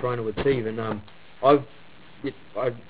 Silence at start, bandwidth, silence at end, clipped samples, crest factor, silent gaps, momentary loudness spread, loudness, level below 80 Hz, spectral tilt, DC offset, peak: 0 s; 4 kHz; 0.1 s; under 0.1%; 20 dB; none; 15 LU; -26 LUFS; -52 dBFS; -10.5 dB/octave; 0.6%; -6 dBFS